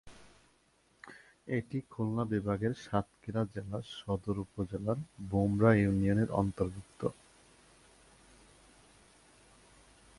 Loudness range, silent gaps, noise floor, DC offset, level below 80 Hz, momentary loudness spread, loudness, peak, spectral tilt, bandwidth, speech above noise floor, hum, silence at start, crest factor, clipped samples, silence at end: 9 LU; none; -70 dBFS; under 0.1%; -56 dBFS; 13 LU; -34 LUFS; -12 dBFS; -8 dB/octave; 11.5 kHz; 37 dB; none; 0.05 s; 22 dB; under 0.1%; 3.05 s